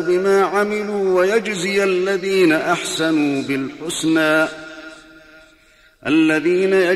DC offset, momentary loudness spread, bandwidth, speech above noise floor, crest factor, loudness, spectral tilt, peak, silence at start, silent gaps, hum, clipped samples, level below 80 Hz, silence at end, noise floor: under 0.1%; 8 LU; 13.5 kHz; 35 dB; 14 dB; -17 LUFS; -4.5 dB/octave; -4 dBFS; 0 s; none; none; under 0.1%; -58 dBFS; 0 s; -52 dBFS